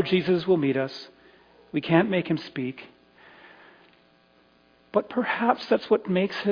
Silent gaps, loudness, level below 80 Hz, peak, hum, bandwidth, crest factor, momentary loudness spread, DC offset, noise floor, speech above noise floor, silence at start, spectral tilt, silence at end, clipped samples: none; -25 LUFS; -68 dBFS; -6 dBFS; none; 5.2 kHz; 20 dB; 11 LU; under 0.1%; -60 dBFS; 36 dB; 0 s; -8 dB/octave; 0 s; under 0.1%